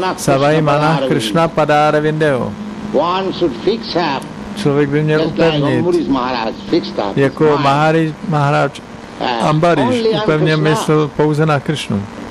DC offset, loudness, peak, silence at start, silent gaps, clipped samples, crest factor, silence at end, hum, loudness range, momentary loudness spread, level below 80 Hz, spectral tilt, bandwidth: under 0.1%; -14 LUFS; -2 dBFS; 0 s; none; under 0.1%; 12 dB; 0 s; none; 2 LU; 7 LU; -44 dBFS; -6 dB/octave; 13.5 kHz